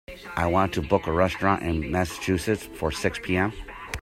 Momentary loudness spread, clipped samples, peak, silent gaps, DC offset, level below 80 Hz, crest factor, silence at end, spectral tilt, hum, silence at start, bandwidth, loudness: 7 LU; under 0.1%; -4 dBFS; none; under 0.1%; -44 dBFS; 20 dB; 0 s; -5.5 dB/octave; none; 0.1 s; 16 kHz; -25 LUFS